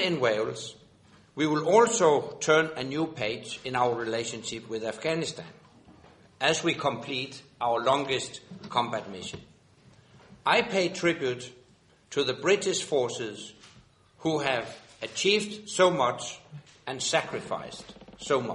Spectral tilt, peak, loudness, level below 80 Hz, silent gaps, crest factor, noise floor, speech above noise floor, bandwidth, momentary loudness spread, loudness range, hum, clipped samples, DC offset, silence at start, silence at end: -3.5 dB/octave; -8 dBFS; -28 LUFS; -66 dBFS; none; 22 dB; -60 dBFS; 33 dB; 11 kHz; 18 LU; 5 LU; none; under 0.1%; under 0.1%; 0 s; 0 s